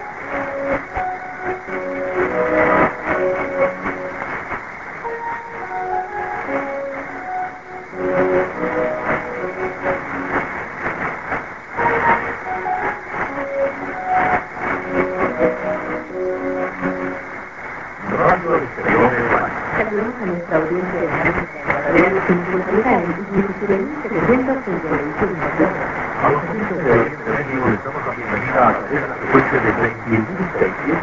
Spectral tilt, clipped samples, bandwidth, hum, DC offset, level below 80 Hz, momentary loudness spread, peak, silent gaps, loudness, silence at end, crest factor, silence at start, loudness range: -8 dB/octave; under 0.1%; 7.6 kHz; none; 0.3%; -44 dBFS; 10 LU; 0 dBFS; none; -20 LUFS; 0 s; 20 dB; 0 s; 5 LU